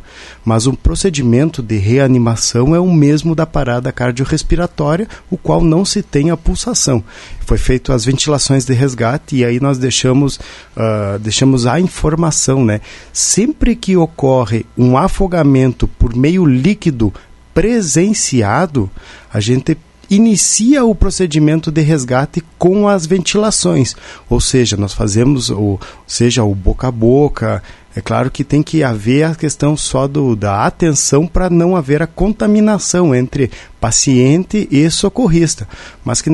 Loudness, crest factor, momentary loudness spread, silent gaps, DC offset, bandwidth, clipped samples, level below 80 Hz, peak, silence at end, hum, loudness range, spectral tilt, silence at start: -13 LUFS; 12 dB; 8 LU; none; under 0.1%; 11.5 kHz; under 0.1%; -26 dBFS; 0 dBFS; 0 s; none; 2 LU; -5 dB/octave; 0.15 s